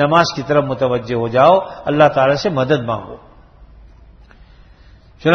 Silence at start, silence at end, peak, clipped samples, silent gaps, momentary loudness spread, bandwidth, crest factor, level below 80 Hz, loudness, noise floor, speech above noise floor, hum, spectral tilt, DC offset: 0 s; 0 s; 0 dBFS; under 0.1%; none; 9 LU; 6.6 kHz; 16 dB; -46 dBFS; -15 LUFS; -44 dBFS; 30 dB; none; -6 dB/octave; under 0.1%